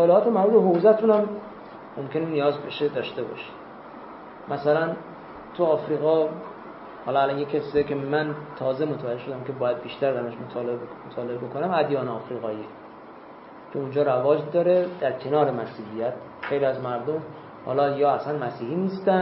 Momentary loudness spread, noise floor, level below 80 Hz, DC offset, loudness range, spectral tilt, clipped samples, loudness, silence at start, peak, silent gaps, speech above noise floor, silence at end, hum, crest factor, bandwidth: 20 LU; -44 dBFS; -64 dBFS; under 0.1%; 5 LU; -11 dB/octave; under 0.1%; -25 LUFS; 0 s; -6 dBFS; none; 20 dB; 0 s; none; 20 dB; 5.8 kHz